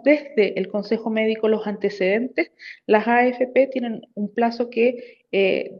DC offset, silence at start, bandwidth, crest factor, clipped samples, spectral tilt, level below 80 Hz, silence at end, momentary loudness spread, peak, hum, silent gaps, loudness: under 0.1%; 0.05 s; 7 kHz; 18 dB; under 0.1%; -7.5 dB/octave; -72 dBFS; 0 s; 10 LU; -2 dBFS; none; none; -21 LUFS